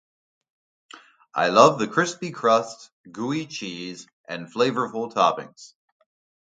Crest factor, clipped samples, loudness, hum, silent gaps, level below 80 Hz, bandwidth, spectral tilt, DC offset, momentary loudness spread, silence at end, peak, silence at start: 24 dB; under 0.1%; -22 LUFS; none; 2.92-3.04 s, 4.13-4.24 s; -72 dBFS; 9.4 kHz; -4.5 dB/octave; under 0.1%; 20 LU; 0.8 s; 0 dBFS; 0.95 s